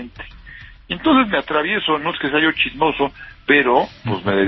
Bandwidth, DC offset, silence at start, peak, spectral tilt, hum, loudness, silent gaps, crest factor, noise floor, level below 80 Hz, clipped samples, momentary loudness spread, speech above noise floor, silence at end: 6 kHz; under 0.1%; 0 s; 0 dBFS; -7.5 dB/octave; none; -17 LUFS; none; 18 dB; -40 dBFS; -44 dBFS; under 0.1%; 14 LU; 21 dB; 0 s